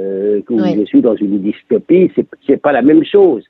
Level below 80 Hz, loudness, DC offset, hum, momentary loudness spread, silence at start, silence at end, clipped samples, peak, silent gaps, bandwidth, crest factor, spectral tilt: -58 dBFS; -12 LUFS; under 0.1%; none; 7 LU; 0 s; 0.1 s; under 0.1%; 0 dBFS; none; 5.6 kHz; 12 dB; -9.5 dB/octave